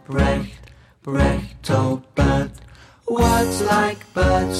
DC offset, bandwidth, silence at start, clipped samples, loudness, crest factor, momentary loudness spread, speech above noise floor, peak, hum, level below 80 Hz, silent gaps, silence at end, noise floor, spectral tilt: under 0.1%; 15.5 kHz; 0.1 s; under 0.1%; -20 LUFS; 14 dB; 10 LU; 26 dB; -6 dBFS; none; -28 dBFS; none; 0 s; -45 dBFS; -6 dB/octave